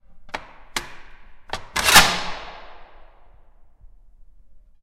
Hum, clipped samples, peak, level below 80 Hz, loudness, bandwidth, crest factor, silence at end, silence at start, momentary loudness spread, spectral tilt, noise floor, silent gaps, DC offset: none; under 0.1%; 0 dBFS; -40 dBFS; -17 LUFS; 16 kHz; 24 dB; 0.25 s; 0.1 s; 24 LU; -0.5 dB/octave; -48 dBFS; none; under 0.1%